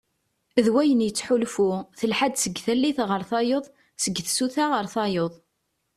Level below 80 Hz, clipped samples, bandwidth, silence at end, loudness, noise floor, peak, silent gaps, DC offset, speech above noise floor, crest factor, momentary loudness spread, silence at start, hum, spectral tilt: -64 dBFS; under 0.1%; 14 kHz; 0.6 s; -24 LUFS; -75 dBFS; -6 dBFS; none; under 0.1%; 52 dB; 20 dB; 7 LU; 0.55 s; none; -4 dB/octave